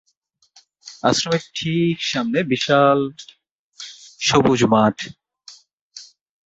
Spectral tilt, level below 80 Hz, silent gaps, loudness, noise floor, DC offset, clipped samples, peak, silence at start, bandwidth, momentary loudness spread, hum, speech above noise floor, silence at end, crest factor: -4.5 dB/octave; -56 dBFS; 3.51-3.72 s, 5.73-5.90 s; -18 LUFS; -65 dBFS; under 0.1%; under 0.1%; -2 dBFS; 0.85 s; 8 kHz; 23 LU; none; 47 dB; 0.45 s; 18 dB